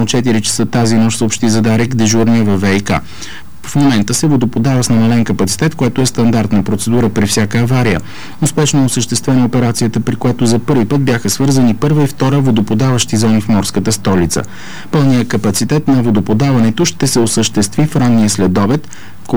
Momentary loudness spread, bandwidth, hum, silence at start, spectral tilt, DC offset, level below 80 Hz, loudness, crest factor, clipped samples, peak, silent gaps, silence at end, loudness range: 5 LU; over 20 kHz; none; 0 s; -5.5 dB/octave; 7%; -38 dBFS; -12 LUFS; 8 dB; under 0.1%; -4 dBFS; none; 0 s; 1 LU